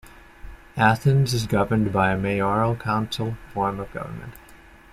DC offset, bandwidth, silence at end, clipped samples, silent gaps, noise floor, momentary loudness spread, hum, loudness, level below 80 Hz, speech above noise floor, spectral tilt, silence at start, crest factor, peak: under 0.1%; 15 kHz; 0.35 s; under 0.1%; none; -48 dBFS; 14 LU; none; -23 LUFS; -46 dBFS; 26 dB; -6.5 dB/octave; 0.05 s; 20 dB; -4 dBFS